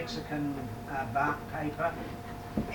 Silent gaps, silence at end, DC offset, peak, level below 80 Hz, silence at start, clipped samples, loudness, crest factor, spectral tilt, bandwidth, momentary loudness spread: none; 0 s; under 0.1%; -18 dBFS; -50 dBFS; 0 s; under 0.1%; -34 LUFS; 16 dB; -6 dB/octave; 19 kHz; 9 LU